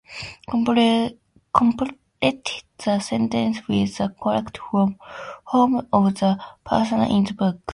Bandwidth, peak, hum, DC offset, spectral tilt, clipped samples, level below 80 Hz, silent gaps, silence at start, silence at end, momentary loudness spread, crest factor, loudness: 11.5 kHz; 0 dBFS; none; under 0.1%; -6 dB/octave; under 0.1%; -52 dBFS; none; 0.1 s; 0 s; 11 LU; 22 dB; -22 LUFS